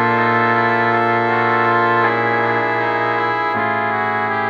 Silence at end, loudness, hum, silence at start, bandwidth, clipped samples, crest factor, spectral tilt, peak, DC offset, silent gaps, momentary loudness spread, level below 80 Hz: 0 s; -16 LUFS; none; 0 s; 7.6 kHz; under 0.1%; 14 dB; -7 dB/octave; -2 dBFS; under 0.1%; none; 3 LU; -60 dBFS